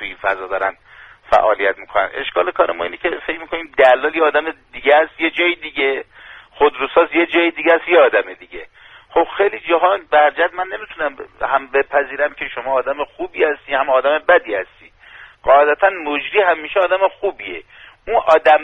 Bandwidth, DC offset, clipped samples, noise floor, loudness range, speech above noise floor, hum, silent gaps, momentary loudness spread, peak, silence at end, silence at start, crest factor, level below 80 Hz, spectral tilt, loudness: 6.6 kHz; under 0.1%; under 0.1%; -42 dBFS; 3 LU; 26 dB; none; none; 12 LU; 0 dBFS; 0 s; 0 s; 16 dB; -50 dBFS; -5 dB/octave; -16 LUFS